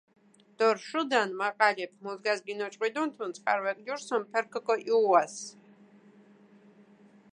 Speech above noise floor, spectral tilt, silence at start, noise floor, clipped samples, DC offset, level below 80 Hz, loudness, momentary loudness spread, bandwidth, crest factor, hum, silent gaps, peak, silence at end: 29 dB; -3 dB/octave; 0.6 s; -58 dBFS; under 0.1%; under 0.1%; under -90 dBFS; -29 LUFS; 11 LU; 10.5 kHz; 22 dB; none; none; -8 dBFS; 1.8 s